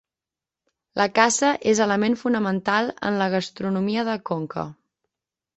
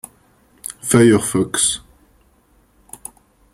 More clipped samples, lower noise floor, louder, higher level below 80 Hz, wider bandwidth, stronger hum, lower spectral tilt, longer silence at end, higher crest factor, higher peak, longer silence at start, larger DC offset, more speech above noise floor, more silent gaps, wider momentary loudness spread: neither; first, -89 dBFS vs -56 dBFS; second, -22 LUFS vs -16 LUFS; second, -64 dBFS vs -52 dBFS; second, 8.6 kHz vs 16 kHz; neither; about the same, -4 dB/octave vs -4 dB/octave; second, 0.85 s vs 1.75 s; about the same, 22 dB vs 20 dB; about the same, -2 dBFS vs 0 dBFS; first, 0.95 s vs 0.7 s; neither; first, 67 dB vs 41 dB; neither; second, 10 LU vs 23 LU